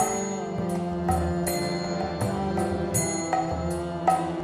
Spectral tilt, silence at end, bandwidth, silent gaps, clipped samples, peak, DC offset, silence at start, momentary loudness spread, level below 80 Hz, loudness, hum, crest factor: -5 dB/octave; 0 s; 13.5 kHz; none; under 0.1%; -8 dBFS; under 0.1%; 0 s; 4 LU; -42 dBFS; -27 LUFS; none; 18 dB